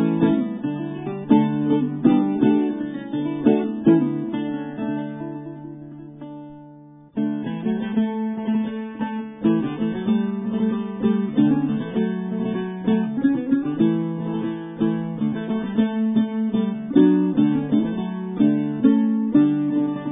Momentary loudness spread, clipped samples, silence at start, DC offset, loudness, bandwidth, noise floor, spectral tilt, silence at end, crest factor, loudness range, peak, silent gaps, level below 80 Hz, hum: 10 LU; under 0.1%; 0 s; under 0.1%; -22 LUFS; 3.8 kHz; -45 dBFS; -12 dB/octave; 0 s; 18 dB; 7 LU; -2 dBFS; none; -60 dBFS; none